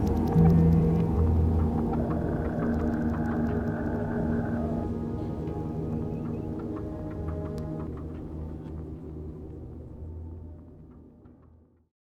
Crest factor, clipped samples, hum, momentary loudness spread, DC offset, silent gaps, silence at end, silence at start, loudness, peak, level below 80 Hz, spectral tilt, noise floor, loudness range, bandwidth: 18 dB; under 0.1%; none; 19 LU; under 0.1%; none; 0.8 s; 0 s; -28 LUFS; -10 dBFS; -38 dBFS; -10.5 dB/octave; -57 dBFS; 16 LU; 6.2 kHz